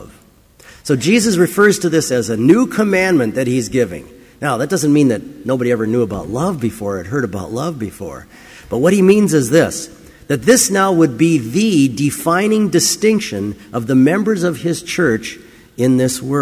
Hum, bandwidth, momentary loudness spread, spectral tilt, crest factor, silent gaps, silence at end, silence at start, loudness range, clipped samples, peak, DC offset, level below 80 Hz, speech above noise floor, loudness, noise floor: none; 16 kHz; 12 LU; -5 dB/octave; 14 dB; none; 0 s; 0 s; 4 LU; under 0.1%; 0 dBFS; under 0.1%; -46 dBFS; 32 dB; -15 LUFS; -47 dBFS